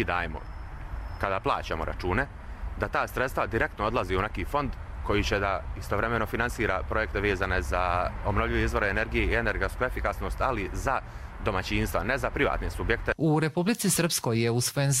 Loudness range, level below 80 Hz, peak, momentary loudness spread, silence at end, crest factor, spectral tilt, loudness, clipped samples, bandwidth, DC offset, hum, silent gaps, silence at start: 3 LU; -36 dBFS; -8 dBFS; 8 LU; 0 s; 20 dB; -4.5 dB/octave; -28 LUFS; under 0.1%; 16 kHz; under 0.1%; none; none; 0 s